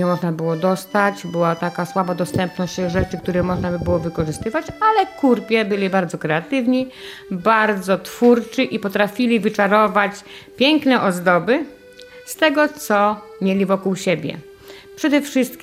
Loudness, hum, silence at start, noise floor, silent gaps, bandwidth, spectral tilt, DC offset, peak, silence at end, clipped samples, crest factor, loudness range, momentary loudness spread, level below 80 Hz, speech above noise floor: -19 LUFS; none; 0 s; -41 dBFS; none; 16 kHz; -5.5 dB/octave; under 0.1%; -2 dBFS; 0 s; under 0.1%; 16 dB; 3 LU; 8 LU; -46 dBFS; 23 dB